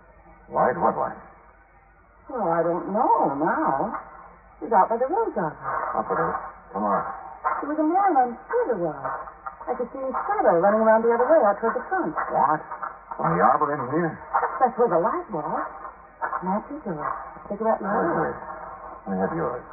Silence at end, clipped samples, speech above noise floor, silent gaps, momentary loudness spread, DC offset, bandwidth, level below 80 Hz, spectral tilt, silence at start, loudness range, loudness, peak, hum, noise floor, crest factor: 0 s; under 0.1%; 31 dB; none; 15 LU; under 0.1%; 2.6 kHz; -56 dBFS; -1.5 dB/octave; 0.3 s; 6 LU; -24 LUFS; -6 dBFS; none; -54 dBFS; 18 dB